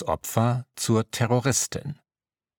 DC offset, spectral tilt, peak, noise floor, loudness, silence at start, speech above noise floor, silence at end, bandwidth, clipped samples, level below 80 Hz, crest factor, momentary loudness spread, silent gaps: under 0.1%; -4.5 dB/octave; -6 dBFS; under -90 dBFS; -25 LUFS; 0 s; over 65 dB; 0.65 s; 19 kHz; under 0.1%; -54 dBFS; 20 dB; 13 LU; none